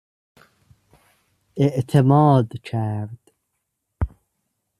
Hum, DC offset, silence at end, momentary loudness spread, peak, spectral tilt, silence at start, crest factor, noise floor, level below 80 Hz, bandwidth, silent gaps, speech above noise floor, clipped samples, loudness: none; under 0.1%; 0.75 s; 16 LU; -2 dBFS; -9 dB/octave; 1.55 s; 20 dB; -76 dBFS; -44 dBFS; 11 kHz; none; 58 dB; under 0.1%; -20 LUFS